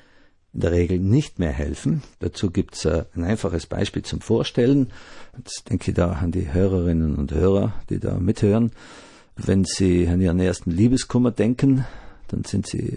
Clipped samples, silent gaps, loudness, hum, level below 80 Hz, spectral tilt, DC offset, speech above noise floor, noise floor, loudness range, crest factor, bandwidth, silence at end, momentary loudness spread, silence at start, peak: under 0.1%; none; -22 LUFS; none; -38 dBFS; -7 dB/octave; under 0.1%; 33 dB; -54 dBFS; 3 LU; 14 dB; 11 kHz; 0 s; 9 LU; 0.55 s; -6 dBFS